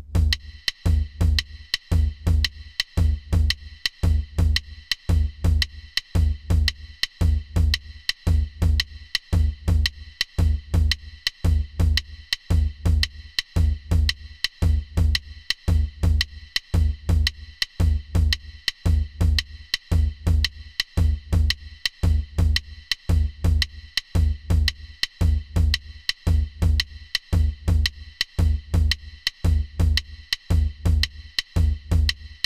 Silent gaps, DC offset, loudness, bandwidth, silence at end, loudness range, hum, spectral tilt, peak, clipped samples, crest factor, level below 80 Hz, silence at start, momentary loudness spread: none; 0.1%; -24 LUFS; 15 kHz; 0.1 s; 1 LU; none; -4.5 dB/octave; -4 dBFS; under 0.1%; 18 dB; -24 dBFS; 0 s; 6 LU